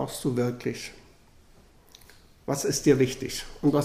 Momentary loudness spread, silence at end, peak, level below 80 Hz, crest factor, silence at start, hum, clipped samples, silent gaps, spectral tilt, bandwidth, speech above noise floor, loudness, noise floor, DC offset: 15 LU; 0 s; -8 dBFS; -52 dBFS; 20 dB; 0 s; none; under 0.1%; none; -5 dB/octave; 15.5 kHz; 29 dB; -27 LUFS; -55 dBFS; under 0.1%